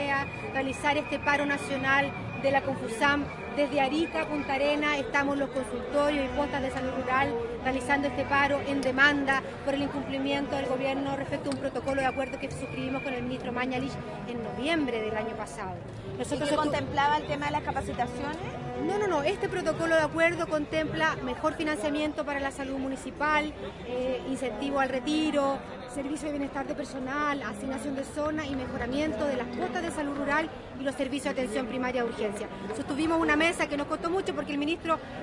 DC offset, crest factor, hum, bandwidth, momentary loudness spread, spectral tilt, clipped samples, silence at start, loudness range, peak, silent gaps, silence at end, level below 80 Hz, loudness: under 0.1%; 20 dB; none; 11.5 kHz; 9 LU; -5 dB/octave; under 0.1%; 0 s; 5 LU; -10 dBFS; none; 0 s; -52 dBFS; -29 LUFS